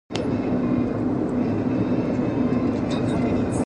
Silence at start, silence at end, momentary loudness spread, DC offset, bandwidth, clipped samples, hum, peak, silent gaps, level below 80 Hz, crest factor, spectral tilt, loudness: 0.1 s; 0 s; 2 LU; under 0.1%; 10.5 kHz; under 0.1%; none; -6 dBFS; none; -42 dBFS; 16 dB; -7.5 dB/octave; -23 LUFS